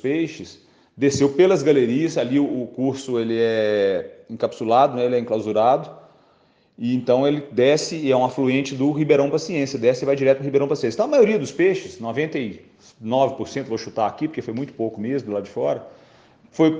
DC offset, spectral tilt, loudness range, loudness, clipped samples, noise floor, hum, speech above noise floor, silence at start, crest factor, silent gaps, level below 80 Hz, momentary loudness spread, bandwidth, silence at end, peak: under 0.1%; -6 dB/octave; 6 LU; -21 LUFS; under 0.1%; -59 dBFS; none; 39 dB; 0.05 s; 16 dB; none; -64 dBFS; 11 LU; 9.8 kHz; 0 s; -4 dBFS